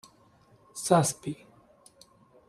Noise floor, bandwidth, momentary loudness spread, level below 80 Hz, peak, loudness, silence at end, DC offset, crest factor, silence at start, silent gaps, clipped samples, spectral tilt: -61 dBFS; 14.5 kHz; 20 LU; -68 dBFS; -6 dBFS; -27 LUFS; 1.15 s; under 0.1%; 26 dB; 0.75 s; none; under 0.1%; -5 dB/octave